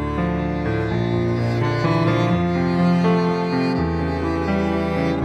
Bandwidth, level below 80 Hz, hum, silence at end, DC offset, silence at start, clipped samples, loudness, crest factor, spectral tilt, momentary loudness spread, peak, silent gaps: 8.2 kHz; -36 dBFS; none; 0 s; under 0.1%; 0 s; under 0.1%; -20 LUFS; 14 dB; -8 dB/octave; 5 LU; -6 dBFS; none